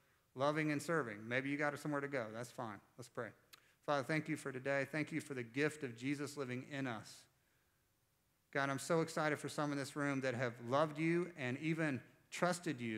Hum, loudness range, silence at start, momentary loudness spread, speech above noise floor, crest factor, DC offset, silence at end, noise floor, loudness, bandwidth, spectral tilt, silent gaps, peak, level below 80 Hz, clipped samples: none; 5 LU; 0.35 s; 11 LU; 39 dB; 22 dB; under 0.1%; 0 s; -79 dBFS; -40 LUFS; 16 kHz; -5.5 dB/octave; none; -20 dBFS; -88 dBFS; under 0.1%